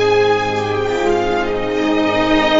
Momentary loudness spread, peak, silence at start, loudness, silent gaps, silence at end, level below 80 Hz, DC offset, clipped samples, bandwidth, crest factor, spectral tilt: 4 LU; -2 dBFS; 0 s; -16 LUFS; none; 0 s; -34 dBFS; under 0.1%; under 0.1%; 7.8 kHz; 12 dB; -5 dB/octave